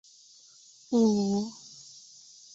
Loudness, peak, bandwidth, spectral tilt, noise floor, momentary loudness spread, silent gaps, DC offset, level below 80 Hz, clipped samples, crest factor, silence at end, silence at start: -27 LUFS; -14 dBFS; 8 kHz; -6.5 dB/octave; -56 dBFS; 24 LU; none; under 0.1%; -70 dBFS; under 0.1%; 16 dB; 0.75 s; 0.9 s